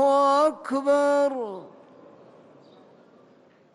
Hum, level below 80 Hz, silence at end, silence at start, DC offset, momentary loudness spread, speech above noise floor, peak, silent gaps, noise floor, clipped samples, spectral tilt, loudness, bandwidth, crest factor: none; -76 dBFS; 2.05 s; 0 s; under 0.1%; 15 LU; 33 dB; -10 dBFS; none; -56 dBFS; under 0.1%; -4 dB/octave; -23 LUFS; 11.5 kHz; 14 dB